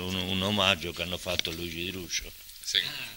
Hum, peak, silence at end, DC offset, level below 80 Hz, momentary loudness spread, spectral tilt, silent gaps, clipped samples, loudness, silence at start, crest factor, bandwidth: none; -6 dBFS; 0 s; under 0.1%; -52 dBFS; 9 LU; -3 dB/octave; none; under 0.1%; -29 LUFS; 0 s; 24 dB; 16.5 kHz